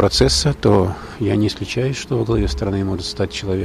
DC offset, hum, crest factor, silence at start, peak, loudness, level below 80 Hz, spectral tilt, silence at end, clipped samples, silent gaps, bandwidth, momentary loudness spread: under 0.1%; none; 16 dB; 0 s; -2 dBFS; -19 LUFS; -30 dBFS; -5 dB/octave; 0 s; under 0.1%; none; 14 kHz; 8 LU